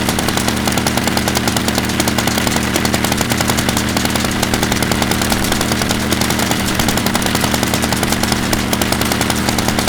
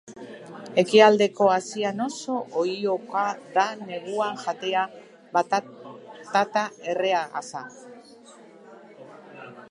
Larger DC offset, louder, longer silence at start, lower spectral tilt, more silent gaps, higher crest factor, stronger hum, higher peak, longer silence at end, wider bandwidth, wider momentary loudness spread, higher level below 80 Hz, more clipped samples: neither; first, -15 LUFS vs -24 LUFS; about the same, 0 s vs 0.05 s; about the same, -3.5 dB/octave vs -4 dB/octave; neither; second, 16 dB vs 22 dB; neither; about the same, 0 dBFS vs -2 dBFS; about the same, 0 s vs 0.05 s; first, over 20 kHz vs 11 kHz; second, 1 LU vs 23 LU; first, -30 dBFS vs -80 dBFS; neither